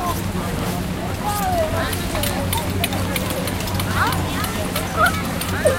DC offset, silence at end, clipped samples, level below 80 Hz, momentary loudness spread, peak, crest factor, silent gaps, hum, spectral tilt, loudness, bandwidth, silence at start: under 0.1%; 0 s; under 0.1%; -34 dBFS; 5 LU; -2 dBFS; 18 dB; none; none; -4.5 dB/octave; -21 LUFS; 17 kHz; 0 s